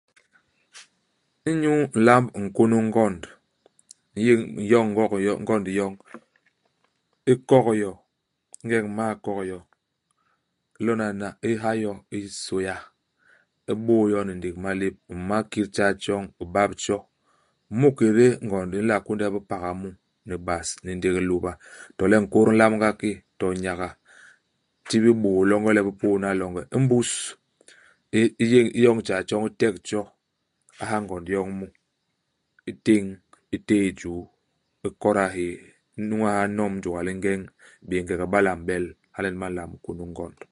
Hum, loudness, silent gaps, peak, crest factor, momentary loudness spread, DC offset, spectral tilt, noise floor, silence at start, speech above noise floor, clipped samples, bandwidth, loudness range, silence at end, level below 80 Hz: none; -24 LUFS; none; 0 dBFS; 24 dB; 16 LU; under 0.1%; -6 dB/octave; -76 dBFS; 0.75 s; 53 dB; under 0.1%; 11.5 kHz; 6 LU; 0.2 s; -52 dBFS